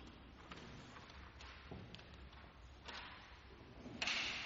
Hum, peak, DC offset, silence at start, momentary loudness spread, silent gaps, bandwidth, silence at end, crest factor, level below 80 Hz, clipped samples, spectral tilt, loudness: none; -26 dBFS; under 0.1%; 0 s; 19 LU; none; 7.4 kHz; 0 s; 26 dB; -62 dBFS; under 0.1%; -1 dB/octave; -49 LUFS